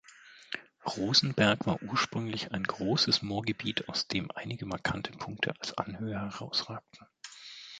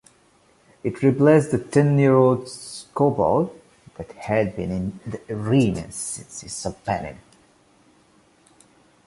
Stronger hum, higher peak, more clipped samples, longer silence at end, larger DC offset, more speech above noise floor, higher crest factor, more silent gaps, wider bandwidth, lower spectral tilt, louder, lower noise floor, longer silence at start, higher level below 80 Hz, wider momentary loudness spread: neither; second, -8 dBFS vs -4 dBFS; neither; second, 0 s vs 1.9 s; neither; second, 23 dB vs 37 dB; about the same, 24 dB vs 20 dB; neither; second, 9.4 kHz vs 11.5 kHz; second, -4 dB/octave vs -6.5 dB/octave; second, -31 LUFS vs -21 LUFS; about the same, -55 dBFS vs -58 dBFS; second, 0.1 s vs 0.85 s; second, -60 dBFS vs -50 dBFS; about the same, 16 LU vs 17 LU